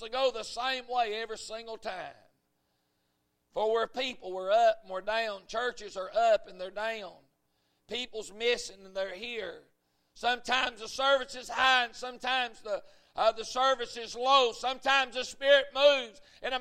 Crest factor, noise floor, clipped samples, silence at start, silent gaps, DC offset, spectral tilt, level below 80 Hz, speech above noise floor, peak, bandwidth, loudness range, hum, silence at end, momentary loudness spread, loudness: 22 dB; -77 dBFS; under 0.1%; 0 s; none; under 0.1%; -1 dB/octave; -64 dBFS; 47 dB; -10 dBFS; 14 kHz; 9 LU; none; 0 s; 15 LU; -30 LUFS